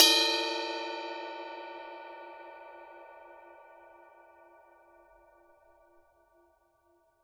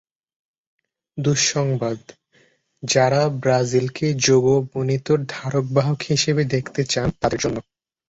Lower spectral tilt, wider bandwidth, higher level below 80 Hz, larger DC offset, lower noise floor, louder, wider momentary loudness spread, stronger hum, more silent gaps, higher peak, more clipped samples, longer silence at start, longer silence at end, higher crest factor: second, 2 dB/octave vs -4.5 dB/octave; first, over 20 kHz vs 8 kHz; second, -80 dBFS vs -50 dBFS; neither; first, -69 dBFS vs -60 dBFS; second, -31 LUFS vs -20 LUFS; first, 26 LU vs 8 LU; neither; neither; about the same, -4 dBFS vs -4 dBFS; neither; second, 0 s vs 1.15 s; first, 3.4 s vs 0.5 s; first, 30 dB vs 18 dB